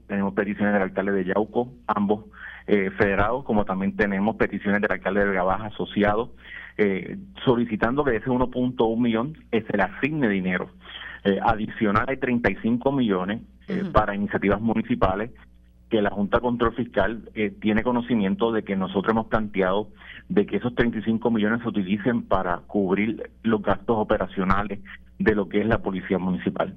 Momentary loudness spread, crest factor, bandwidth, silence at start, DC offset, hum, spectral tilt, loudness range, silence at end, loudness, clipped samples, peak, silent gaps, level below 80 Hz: 6 LU; 18 dB; 5.4 kHz; 0.1 s; under 0.1%; none; -9 dB/octave; 1 LU; 0 s; -24 LUFS; under 0.1%; -4 dBFS; none; -42 dBFS